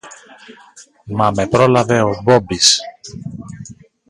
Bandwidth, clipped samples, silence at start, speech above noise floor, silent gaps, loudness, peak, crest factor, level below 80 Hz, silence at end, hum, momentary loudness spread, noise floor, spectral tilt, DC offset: 16 kHz; under 0.1%; 0.05 s; 21 dB; none; -14 LUFS; 0 dBFS; 16 dB; -46 dBFS; 0.35 s; none; 20 LU; -37 dBFS; -3.5 dB/octave; under 0.1%